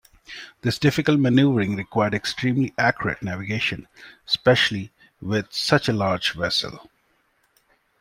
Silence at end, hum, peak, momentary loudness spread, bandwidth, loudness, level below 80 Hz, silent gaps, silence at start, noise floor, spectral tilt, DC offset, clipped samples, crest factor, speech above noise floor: 1.2 s; none; -4 dBFS; 16 LU; 16 kHz; -22 LUFS; -54 dBFS; none; 0.3 s; -66 dBFS; -5.5 dB/octave; under 0.1%; under 0.1%; 20 dB; 44 dB